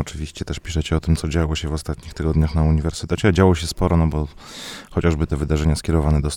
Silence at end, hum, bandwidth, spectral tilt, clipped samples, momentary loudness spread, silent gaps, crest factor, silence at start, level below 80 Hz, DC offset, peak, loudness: 0 s; none; 13 kHz; -6.5 dB/octave; under 0.1%; 12 LU; none; 18 dB; 0 s; -26 dBFS; under 0.1%; -2 dBFS; -21 LUFS